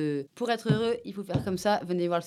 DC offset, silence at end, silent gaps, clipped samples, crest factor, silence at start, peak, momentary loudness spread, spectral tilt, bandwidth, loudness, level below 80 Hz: under 0.1%; 0 s; none; under 0.1%; 18 dB; 0 s; -12 dBFS; 6 LU; -6.5 dB/octave; 15 kHz; -29 LUFS; -60 dBFS